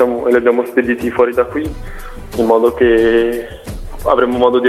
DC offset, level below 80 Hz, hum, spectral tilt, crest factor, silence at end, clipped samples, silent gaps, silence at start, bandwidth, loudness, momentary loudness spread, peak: under 0.1%; -32 dBFS; none; -6 dB/octave; 14 dB; 0 s; under 0.1%; none; 0 s; 14.5 kHz; -14 LUFS; 18 LU; 0 dBFS